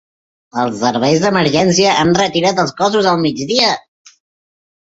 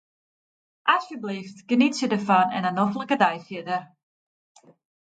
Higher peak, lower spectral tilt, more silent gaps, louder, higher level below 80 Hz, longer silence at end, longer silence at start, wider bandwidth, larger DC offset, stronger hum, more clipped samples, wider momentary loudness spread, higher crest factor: first, 0 dBFS vs -4 dBFS; about the same, -4 dB/octave vs -5 dB/octave; neither; first, -14 LUFS vs -24 LUFS; first, -50 dBFS vs -74 dBFS; about the same, 1.15 s vs 1.2 s; second, 0.55 s vs 0.85 s; second, 8 kHz vs 9 kHz; neither; neither; neither; second, 7 LU vs 12 LU; second, 16 dB vs 22 dB